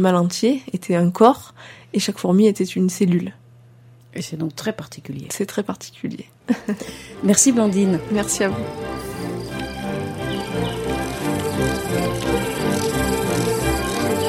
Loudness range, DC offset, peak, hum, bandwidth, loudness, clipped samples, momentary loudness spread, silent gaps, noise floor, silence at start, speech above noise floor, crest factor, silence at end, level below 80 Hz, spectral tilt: 8 LU; under 0.1%; 0 dBFS; none; 16.5 kHz; -21 LUFS; under 0.1%; 15 LU; none; -47 dBFS; 0 s; 28 dB; 20 dB; 0 s; -40 dBFS; -5 dB/octave